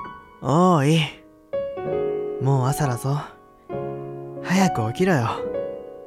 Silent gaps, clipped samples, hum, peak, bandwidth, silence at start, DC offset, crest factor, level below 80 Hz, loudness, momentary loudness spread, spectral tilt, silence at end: none; under 0.1%; none; -4 dBFS; 14.5 kHz; 0 s; under 0.1%; 18 dB; -52 dBFS; -23 LUFS; 15 LU; -6.5 dB/octave; 0 s